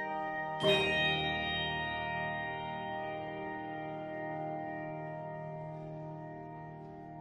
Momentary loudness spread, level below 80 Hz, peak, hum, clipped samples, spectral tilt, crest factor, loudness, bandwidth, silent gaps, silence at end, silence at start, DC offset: 16 LU; -60 dBFS; -16 dBFS; none; under 0.1%; -5 dB/octave; 22 dB; -36 LUFS; 12.5 kHz; none; 0 s; 0 s; under 0.1%